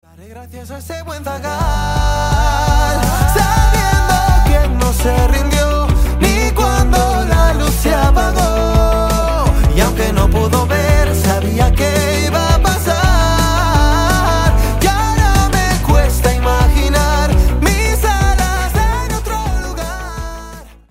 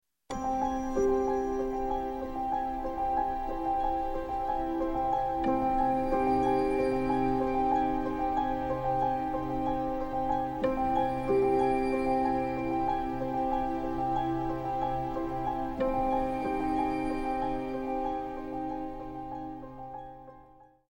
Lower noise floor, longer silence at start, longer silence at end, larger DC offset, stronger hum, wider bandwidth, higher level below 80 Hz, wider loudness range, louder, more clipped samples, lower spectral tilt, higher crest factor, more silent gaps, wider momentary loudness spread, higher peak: second, -33 dBFS vs -56 dBFS; about the same, 0.2 s vs 0.3 s; second, 0.2 s vs 0.45 s; neither; neither; about the same, 16.5 kHz vs 17 kHz; first, -16 dBFS vs -44 dBFS; about the same, 2 LU vs 4 LU; first, -14 LUFS vs -30 LUFS; neither; second, -5 dB/octave vs -7.5 dB/octave; about the same, 12 dB vs 14 dB; neither; about the same, 8 LU vs 8 LU; first, 0 dBFS vs -16 dBFS